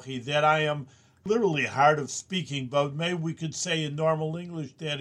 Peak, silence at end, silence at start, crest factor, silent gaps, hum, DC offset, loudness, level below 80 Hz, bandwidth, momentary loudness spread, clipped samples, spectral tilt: -8 dBFS; 0 s; 0 s; 20 dB; none; none; under 0.1%; -27 LUFS; -70 dBFS; 11 kHz; 11 LU; under 0.1%; -4.5 dB/octave